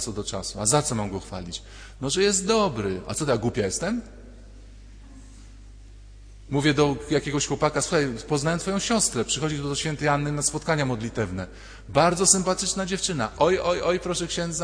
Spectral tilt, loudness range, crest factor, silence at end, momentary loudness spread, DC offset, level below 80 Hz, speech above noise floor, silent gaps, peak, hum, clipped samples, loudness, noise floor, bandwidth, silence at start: -3.5 dB/octave; 7 LU; 22 dB; 0 s; 10 LU; under 0.1%; -44 dBFS; 20 dB; none; -2 dBFS; none; under 0.1%; -24 LUFS; -45 dBFS; 10.5 kHz; 0 s